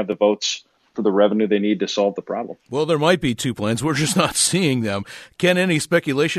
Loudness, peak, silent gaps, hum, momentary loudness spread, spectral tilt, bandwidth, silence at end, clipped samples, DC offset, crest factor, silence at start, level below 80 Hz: -20 LUFS; -2 dBFS; none; none; 11 LU; -4 dB/octave; 13.5 kHz; 0 s; under 0.1%; under 0.1%; 16 dB; 0 s; -54 dBFS